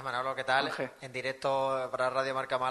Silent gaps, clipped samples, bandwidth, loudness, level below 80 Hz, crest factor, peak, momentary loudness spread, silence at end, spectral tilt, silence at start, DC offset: none; under 0.1%; 12 kHz; -32 LUFS; -74 dBFS; 18 dB; -14 dBFS; 7 LU; 0 s; -4 dB/octave; 0 s; under 0.1%